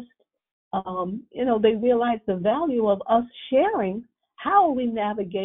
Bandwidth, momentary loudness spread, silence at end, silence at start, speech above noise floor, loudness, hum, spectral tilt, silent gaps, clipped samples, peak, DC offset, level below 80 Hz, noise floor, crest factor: 3.9 kHz; 11 LU; 0 s; 0 s; 32 dB; -23 LUFS; none; -4.5 dB/octave; 0.51-0.71 s; under 0.1%; -6 dBFS; under 0.1%; -60 dBFS; -54 dBFS; 16 dB